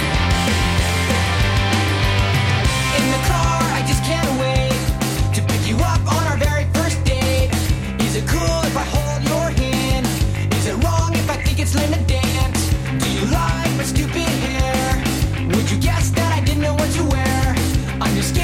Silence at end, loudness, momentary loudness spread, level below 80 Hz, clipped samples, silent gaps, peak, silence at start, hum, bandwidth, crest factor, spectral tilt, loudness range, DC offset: 0 s; -18 LUFS; 3 LU; -24 dBFS; under 0.1%; none; -8 dBFS; 0 s; none; 16.5 kHz; 10 dB; -5 dB/octave; 2 LU; under 0.1%